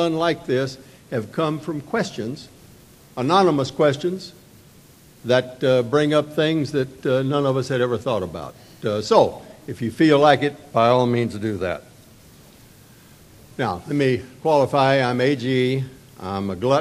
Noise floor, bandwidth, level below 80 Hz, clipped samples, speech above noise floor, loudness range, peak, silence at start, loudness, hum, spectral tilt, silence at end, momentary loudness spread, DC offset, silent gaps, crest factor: -49 dBFS; 15 kHz; -56 dBFS; under 0.1%; 29 dB; 5 LU; 0 dBFS; 0 s; -21 LUFS; none; -6.5 dB/octave; 0 s; 15 LU; under 0.1%; none; 22 dB